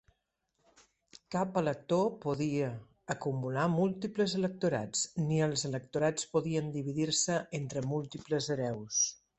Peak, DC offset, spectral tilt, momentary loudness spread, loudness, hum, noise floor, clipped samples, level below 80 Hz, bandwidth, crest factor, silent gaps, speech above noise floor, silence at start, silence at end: -16 dBFS; under 0.1%; -4.5 dB/octave; 6 LU; -33 LUFS; none; -80 dBFS; under 0.1%; -68 dBFS; 8.4 kHz; 18 dB; none; 48 dB; 1.3 s; 0.25 s